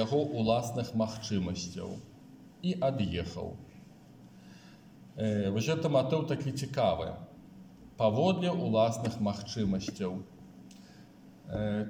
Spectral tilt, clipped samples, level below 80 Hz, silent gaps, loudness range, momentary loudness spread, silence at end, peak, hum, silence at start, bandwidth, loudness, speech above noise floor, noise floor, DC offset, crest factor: -6.5 dB/octave; under 0.1%; -60 dBFS; none; 6 LU; 24 LU; 0 s; -14 dBFS; none; 0 s; 16.5 kHz; -32 LUFS; 23 dB; -54 dBFS; under 0.1%; 18 dB